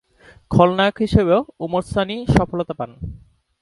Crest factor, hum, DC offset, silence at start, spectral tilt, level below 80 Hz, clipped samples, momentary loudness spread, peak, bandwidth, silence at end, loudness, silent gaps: 20 dB; none; under 0.1%; 0.5 s; -7.5 dB/octave; -36 dBFS; under 0.1%; 13 LU; 0 dBFS; 11.5 kHz; 0.45 s; -19 LUFS; none